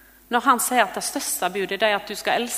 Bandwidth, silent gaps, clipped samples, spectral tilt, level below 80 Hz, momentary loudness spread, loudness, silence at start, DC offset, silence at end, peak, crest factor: 16 kHz; none; under 0.1%; -1.5 dB/octave; -60 dBFS; 6 LU; -22 LUFS; 0.3 s; under 0.1%; 0 s; -2 dBFS; 20 dB